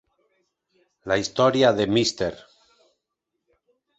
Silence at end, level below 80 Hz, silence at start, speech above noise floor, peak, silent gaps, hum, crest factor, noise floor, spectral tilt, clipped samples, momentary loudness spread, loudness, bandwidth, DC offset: 1.65 s; -56 dBFS; 1.05 s; 60 dB; -4 dBFS; none; none; 20 dB; -81 dBFS; -4.5 dB/octave; under 0.1%; 11 LU; -22 LUFS; 8.2 kHz; under 0.1%